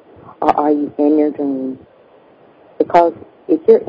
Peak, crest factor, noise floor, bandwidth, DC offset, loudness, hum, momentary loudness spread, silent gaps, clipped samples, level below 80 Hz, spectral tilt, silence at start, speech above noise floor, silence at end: 0 dBFS; 16 dB; -47 dBFS; 7 kHz; under 0.1%; -16 LUFS; none; 12 LU; none; 0.2%; -58 dBFS; -8 dB/octave; 0.25 s; 33 dB; 0 s